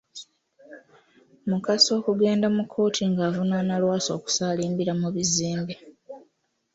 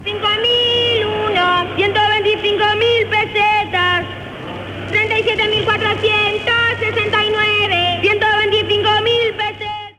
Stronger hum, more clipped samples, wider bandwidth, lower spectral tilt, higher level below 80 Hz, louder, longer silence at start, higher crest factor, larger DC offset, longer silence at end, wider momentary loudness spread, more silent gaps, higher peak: neither; neither; second, 8 kHz vs 12 kHz; about the same, -4.5 dB/octave vs -4.5 dB/octave; second, -64 dBFS vs -46 dBFS; second, -24 LUFS vs -14 LUFS; first, 0.15 s vs 0 s; first, 20 dB vs 12 dB; neither; first, 0.55 s vs 0.05 s; first, 16 LU vs 6 LU; neither; about the same, -6 dBFS vs -4 dBFS